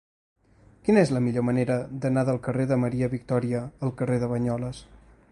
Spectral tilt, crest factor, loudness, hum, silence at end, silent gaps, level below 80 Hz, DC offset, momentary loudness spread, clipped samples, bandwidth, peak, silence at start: -8 dB/octave; 20 dB; -26 LUFS; none; 0.5 s; none; -54 dBFS; under 0.1%; 10 LU; under 0.1%; 11 kHz; -6 dBFS; 0.85 s